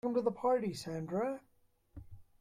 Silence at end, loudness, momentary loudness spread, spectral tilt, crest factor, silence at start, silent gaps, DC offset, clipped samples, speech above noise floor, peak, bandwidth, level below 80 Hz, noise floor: 0.2 s; -36 LUFS; 23 LU; -6.5 dB/octave; 18 dB; 0.05 s; none; under 0.1%; under 0.1%; 21 dB; -18 dBFS; 15 kHz; -64 dBFS; -56 dBFS